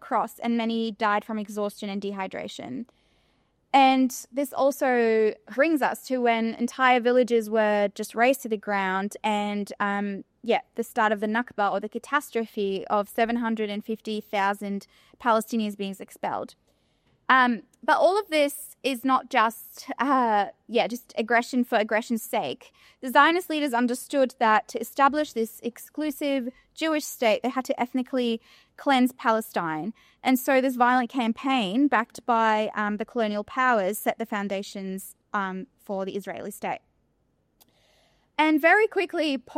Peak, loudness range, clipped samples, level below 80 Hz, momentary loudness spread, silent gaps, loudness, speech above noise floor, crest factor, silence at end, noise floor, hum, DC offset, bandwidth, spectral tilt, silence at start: -6 dBFS; 5 LU; under 0.1%; -72 dBFS; 13 LU; none; -25 LUFS; 45 dB; 20 dB; 0 s; -70 dBFS; none; under 0.1%; 16 kHz; -4 dB/octave; 0 s